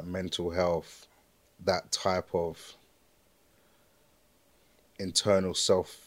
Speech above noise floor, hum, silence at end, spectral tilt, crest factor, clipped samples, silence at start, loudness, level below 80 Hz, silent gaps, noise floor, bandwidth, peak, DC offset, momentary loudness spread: 37 dB; none; 0.1 s; -3.5 dB/octave; 22 dB; under 0.1%; 0 s; -30 LUFS; -66 dBFS; none; -66 dBFS; 16 kHz; -10 dBFS; under 0.1%; 14 LU